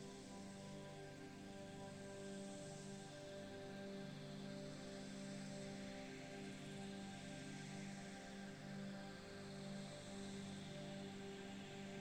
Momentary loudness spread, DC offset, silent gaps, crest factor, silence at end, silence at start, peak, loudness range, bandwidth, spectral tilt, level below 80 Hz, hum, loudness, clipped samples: 3 LU; under 0.1%; none; 14 dB; 0 s; 0 s; -40 dBFS; 2 LU; 16.5 kHz; -5 dB/octave; -74 dBFS; 50 Hz at -75 dBFS; -53 LUFS; under 0.1%